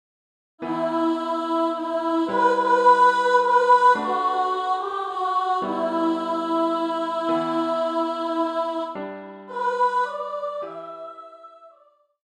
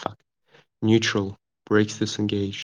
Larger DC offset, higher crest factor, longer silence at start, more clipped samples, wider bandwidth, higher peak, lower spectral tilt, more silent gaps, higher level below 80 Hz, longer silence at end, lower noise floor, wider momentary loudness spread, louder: neither; about the same, 18 dB vs 18 dB; first, 0.6 s vs 0 s; neither; about the same, 10.5 kHz vs 9.8 kHz; about the same, -4 dBFS vs -6 dBFS; about the same, -5 dB/octave vs -5 dB/octave; neither; second, -74 dBFS vs -66 dBFS; first, 0.6 s vs 0.15 s; about the same, -58 dBFS vs -60 dBFS; first, 16 LU vs 9 LU; about the same, -22 LUFS vs -24 LUFS